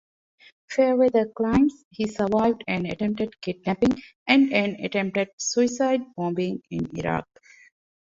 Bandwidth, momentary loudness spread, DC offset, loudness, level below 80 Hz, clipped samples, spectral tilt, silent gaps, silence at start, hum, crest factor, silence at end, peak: 7.8 kHz; 10 LU; under 0.1%; -24 LUFS; -52 dBFS; under 0.1%; -5 dB/octave; 1.85-1.91 s, 4.15-4.26 s, 5.33-5.38 s; 0.7 s; none; 20 dB; 0.85 s; -4 dBFS